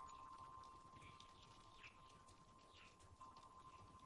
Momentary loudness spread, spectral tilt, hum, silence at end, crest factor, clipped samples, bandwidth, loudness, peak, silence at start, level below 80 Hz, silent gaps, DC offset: 7 LU; -3.5 dB/octave; none; 0 s; 18 dB; under 0.1%; 11 kHz; -63 LUFS; -46 dBFS; 0 s; -76 dBFS; none; under 0.1%